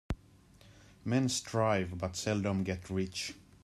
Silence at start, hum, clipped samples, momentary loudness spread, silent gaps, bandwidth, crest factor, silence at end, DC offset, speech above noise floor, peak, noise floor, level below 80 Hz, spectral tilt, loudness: 0.1 s; none; under 0.1%; 11 LU; none; 13.5 kHz; 18 dB; 0.2 s; under 0.1%; 27 dB; -16 dBFS; -60 dBFS; -54 dBFS; -5 dB/octave; -34 LUFS